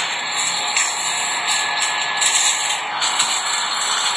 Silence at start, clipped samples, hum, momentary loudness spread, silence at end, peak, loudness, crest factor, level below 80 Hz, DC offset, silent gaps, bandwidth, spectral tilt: 0 s; under 0.1%; none; 4 LU; 0 s; -2 dBFS; -17 LUFS; 18 dB; -78 dBFS; under 0.1%; none; 11 kHz; 2.5 dB/octave